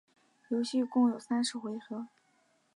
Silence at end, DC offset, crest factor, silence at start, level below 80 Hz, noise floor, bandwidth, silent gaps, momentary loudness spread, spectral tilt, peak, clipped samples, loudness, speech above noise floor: 0.7 s; under 0.1%; 16 dB; 0.5 s; -88 dBFS; -71 dBFS; 11 kHz; none; 14 LU; -4 dB/octave; -16 dBFS; under 0.1%; -33 LUFS; 40 dB